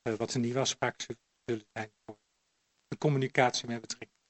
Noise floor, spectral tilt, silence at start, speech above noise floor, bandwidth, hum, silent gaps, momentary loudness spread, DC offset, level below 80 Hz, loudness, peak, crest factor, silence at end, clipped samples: -77 dBFS; -4.5 dB/octave; 0.05 s; 45 dB; 8.4 kHz; none; none; 17 LU; under 0.1%; -72 dBFS; -32 LUFS; -10 dBFS; 24 dB; 0.25 s; under 0.1%